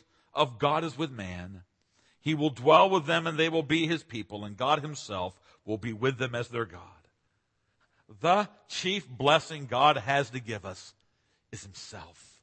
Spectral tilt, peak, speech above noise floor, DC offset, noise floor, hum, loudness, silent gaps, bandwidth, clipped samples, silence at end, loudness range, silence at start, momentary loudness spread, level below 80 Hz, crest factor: -5 dB/octave; -6 dBFS; 47 dB; under 0.1%; -76 dBFS; none; -28 LUFS; none; 8.8 kHz; under 0.1%; 0.35 s; 7 LU; 0.35 s; 19 LU; -66 dBFS; 24 dB